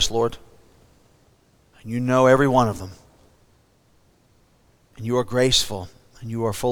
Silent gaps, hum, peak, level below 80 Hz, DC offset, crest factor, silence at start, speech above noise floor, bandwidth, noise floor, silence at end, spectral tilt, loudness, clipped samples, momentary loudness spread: none; none; -4 dBFS; -46 dBFS; under 0.1%; 20 dB; 0 s; 39 dB; over 20 kHz; -59 dBFS; 0 s; -4.5 dB/octave; -20 LUFS; under 0.1%; 22 LU